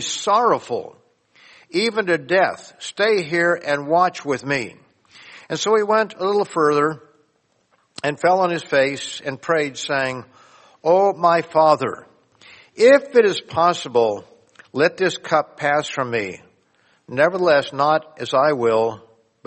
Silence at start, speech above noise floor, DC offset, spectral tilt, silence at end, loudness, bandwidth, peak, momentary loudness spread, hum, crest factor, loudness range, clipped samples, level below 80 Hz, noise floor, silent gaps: 0 s; 46 dB; under 0.1%; -4 dB/octave; 0.5 s; -19 LUFS; 8.8 kHz; -2 dBFS; 12 LU; none; 18 dB; 4 LU; under 0.1%; -66 dBFS; -65 dBFS; none